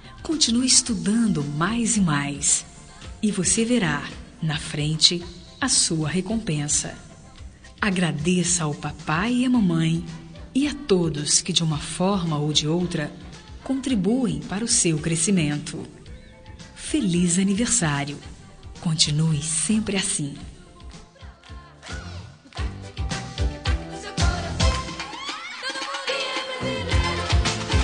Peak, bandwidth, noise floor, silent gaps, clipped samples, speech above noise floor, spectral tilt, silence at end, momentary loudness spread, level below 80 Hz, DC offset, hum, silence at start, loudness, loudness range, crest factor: -2 dBFS; 10 kHz; -44 dBFS; none; under 0.1%; 22 dB; -3.5 dB/octave; 0 s; 17 LU; -36 dBFS; under 0.1%; none; 0.05 s; -23 LUFS; 6 LU; 22 dB